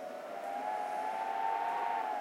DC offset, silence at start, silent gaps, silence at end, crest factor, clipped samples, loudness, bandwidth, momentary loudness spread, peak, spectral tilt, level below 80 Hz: under 0.1%; 0 s; none; 0 s; 14 dB; under 0.1%; -36 LUFS; 16.5 kHz; 7 LU; -22 dBFS; -3 dB/octave; under -90 dBFS